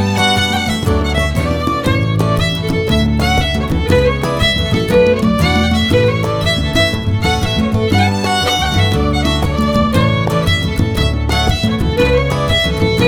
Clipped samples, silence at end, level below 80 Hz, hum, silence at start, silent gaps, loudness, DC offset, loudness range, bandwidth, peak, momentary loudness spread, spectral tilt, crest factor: under 0.1%; 0 s; -24 dBFS; none; 0 s; none; -14 LUFS; under 0.1%; 1 LU; 19 kHz; 0 dBFS; 3 LU; -5.5 dB/octave; 14 dB